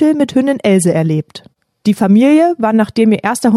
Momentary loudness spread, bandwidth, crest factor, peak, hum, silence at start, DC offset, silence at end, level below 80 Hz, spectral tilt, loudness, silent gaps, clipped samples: 8 LU; 13.5 kHz; 10 dB; -2 dBFS; none; 0 s; under 0.1%; 0 s; -56 dBFS; -6.5 dB/octave; -12 LUFS; none; under 0.1%